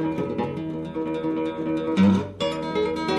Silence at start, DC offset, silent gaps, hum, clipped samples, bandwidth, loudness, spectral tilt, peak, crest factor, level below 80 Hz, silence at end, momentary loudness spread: 0 s; under 0.1%; none; none; under 0.1%; 10 kHz; -25 LUFS; -7 dB/octave; -8 dBFS; 16 dB; -54 dBFS; 0 s; 9 LU